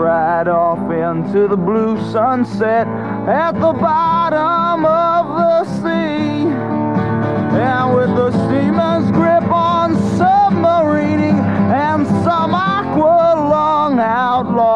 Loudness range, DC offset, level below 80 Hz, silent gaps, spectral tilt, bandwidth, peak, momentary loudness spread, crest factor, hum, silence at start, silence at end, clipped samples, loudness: 2 LU; 0.4%; -48 dBFS; none; -8 dB/octave; 9.6 kHz; -2 dBFS; 4 LU; 12 dB; none; 0 s; 0 s; under 0.1%; -14 LUFS